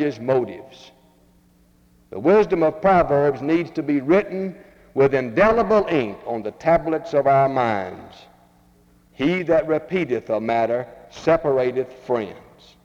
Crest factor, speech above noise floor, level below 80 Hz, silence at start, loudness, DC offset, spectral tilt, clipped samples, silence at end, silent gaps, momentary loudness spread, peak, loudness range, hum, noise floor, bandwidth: 18 dB; 36 dB; -48 dBFS; 0 s; -20 LUFS; under 0.1%; -7.5 dB/octave; under 0.1%; 0.45 s; none; 12 LU; -4 dBFS; 4 LU; none; -56 dBFS; 7.6 kHz